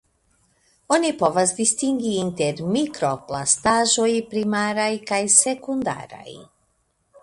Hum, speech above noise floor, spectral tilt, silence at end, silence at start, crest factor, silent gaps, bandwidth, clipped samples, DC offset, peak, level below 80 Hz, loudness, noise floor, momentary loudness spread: none; 47 dB; -3 dB/octave; 0.8 s; 0.9 s; 22 dB; none; 11.5 kHz; under 0.1%; under 0.1%; 0 dBFS; -60 dBFS; -20 LUFS; -68 dBFS; 10 LU